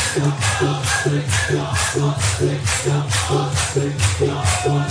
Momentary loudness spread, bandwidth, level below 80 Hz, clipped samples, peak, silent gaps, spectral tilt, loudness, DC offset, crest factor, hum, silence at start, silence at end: 1 LU; 11 kHz; -36 dBFS; under 0.1%; -4 dBFS; none; -4 dB/octave; -19 LUFS; under 0.1%; 14 dB; none; 0 s; 0 s